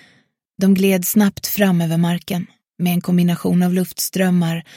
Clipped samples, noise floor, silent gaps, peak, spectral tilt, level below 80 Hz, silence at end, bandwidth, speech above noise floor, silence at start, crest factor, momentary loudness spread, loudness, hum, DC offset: under 0.1%; -58 dBFS; none; -2 dBFS; -6 dB/octave; -56 dBFS; 0.15 s; 17 kHz; 42 dB; 0.6 s; 16 dB; 7 LU; -17 LUFS; none; under 0.1%